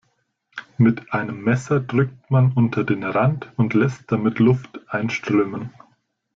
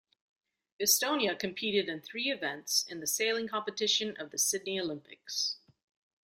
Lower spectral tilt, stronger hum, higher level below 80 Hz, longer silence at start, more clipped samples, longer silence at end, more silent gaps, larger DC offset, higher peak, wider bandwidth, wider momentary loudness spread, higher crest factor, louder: first, -8 dB/octave vs -1 dB/octave; neither; first, -56 dBFS vs -78 dBFS; second, 0.55 s vs 0.8 s; neither; about the same, 0.65 s vs 0.65 s; neither; neither; first, -4 dBFS vs -10 dBFS; second, 7.6 kHz vs 16 kHz; about the same, 10 LU vs 9 LU; second, 16 dB vs 24 dB; first, -21 LUFS vs -31 LUFS